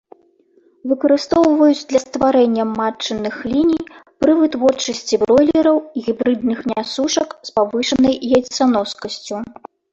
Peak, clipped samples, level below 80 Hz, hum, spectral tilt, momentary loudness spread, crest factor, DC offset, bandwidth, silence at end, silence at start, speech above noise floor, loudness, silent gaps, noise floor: -2 dBFS; under 0.1%; -52 dBFS; none; -4 dB/octave; 10 LU; 14 dB; under 0.1%; 8 kHz; 0.5 s; 0.85 s; 39 dB; -17 LUFS; none; -55 dBFS